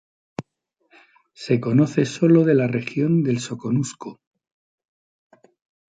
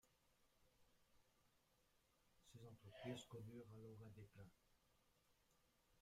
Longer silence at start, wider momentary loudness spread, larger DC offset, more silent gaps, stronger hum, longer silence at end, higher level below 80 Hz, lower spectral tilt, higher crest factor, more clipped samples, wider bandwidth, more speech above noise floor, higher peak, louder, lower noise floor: first, 0.4 s vs 0.05 s; first, 21 LU vs 13 LU; neither; neither; neither; first, 1.75 s vs 0 s; first, -64 dBFS vs -84 dBFS; first, -7 dB/octave vs -5.5 dB/octave; second, 18 dB vs 24 dB; neither; second, 9.4 kHz vs 15.5 kHz; first, 51 dB vs 23 dB; first, -6 dBFS vs -40 dBFS; first, -20 LUFS vs -60 LUFS; second, -71 dBFS vs -82 dBFS